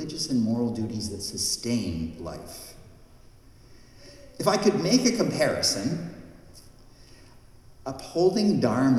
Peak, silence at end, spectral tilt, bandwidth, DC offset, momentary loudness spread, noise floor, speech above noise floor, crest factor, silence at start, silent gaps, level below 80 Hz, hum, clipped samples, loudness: -8 dBFS; 0 s; -4.5 dB/octave; 15 kHz; under 0.1%; 19 LU; -51 dBFS; 26 dB; 20 dB; 0 s; none; -52 dBFS; none; under 0.1%; -25 LUFS